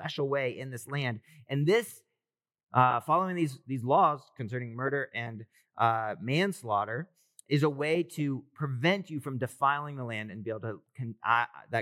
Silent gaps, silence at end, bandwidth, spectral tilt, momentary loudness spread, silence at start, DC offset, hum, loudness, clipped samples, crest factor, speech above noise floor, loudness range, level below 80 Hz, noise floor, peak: 2.63-2.67 s; 0 s; 16 kHz; -6 dB/octave; 13 LU; 0 s; under 0.1%; none; -30 LUFS; under 0.1%; 22 dB; over 60 dB; 3 LU; -86 dBFS; under -90 dBFS; -8 dBFS